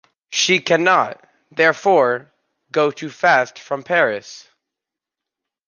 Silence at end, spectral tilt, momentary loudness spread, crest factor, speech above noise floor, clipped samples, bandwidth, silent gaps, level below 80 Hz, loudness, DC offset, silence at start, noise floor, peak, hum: 1.3 s; -3 dB/octave; 12 LU; 18 dB; 68 dB; under 0.1%; 10 kHz; none; -72 dBFS; -17 LUFS; under 0.1%; 0.3 s; -85 dBFS; -2 dBFS; none